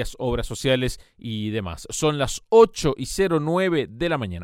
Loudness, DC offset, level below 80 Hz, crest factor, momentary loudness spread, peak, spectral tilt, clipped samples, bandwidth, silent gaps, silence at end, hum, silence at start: -22 LUFS; under 0.1%; -40 dBFS; 18 dB; 13 LU; -4 dBFS; -5 dB/octave; under 0.1%; 16 kHz; none; 0 s; none; 0 s